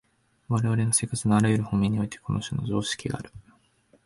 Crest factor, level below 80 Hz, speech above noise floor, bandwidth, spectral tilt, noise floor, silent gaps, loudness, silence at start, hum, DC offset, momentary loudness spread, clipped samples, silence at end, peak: 16 dB; -52 dBFS; 38 dB; 11.5 kHz; -5 dB/octave; -63 dBFS; none; -26 LUFS; 0.5 s; none; under 0.1%; 9 LU; under 0.1%; 0.65 s; -10 dBFS